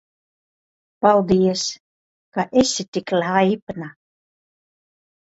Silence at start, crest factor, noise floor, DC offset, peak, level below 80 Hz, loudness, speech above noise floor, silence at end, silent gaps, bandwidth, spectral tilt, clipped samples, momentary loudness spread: 1 s; 22 dB; under -90 dBFS; under 0.1%; 0 dBFS; -56 dBFS; -19 LUFS; over 71 dB; 1.4 s; 1.80-2.32 s, 2.88-2.92 s, 3.62-3.67 s; 8 kHz; -4.5 dB/octave; under 0.1%; 16 LU